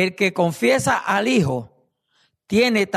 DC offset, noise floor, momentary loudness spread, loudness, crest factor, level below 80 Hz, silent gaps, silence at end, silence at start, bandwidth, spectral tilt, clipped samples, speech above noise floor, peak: under 0.1%; -65 dBFS; 5 LU; -19 LUFS; 14 dB; -56 dBFS; none; 0 s; 0 s; 13.5 kHz; -5 dB/octave; under 0.1%; 46 dB; -6 dBFS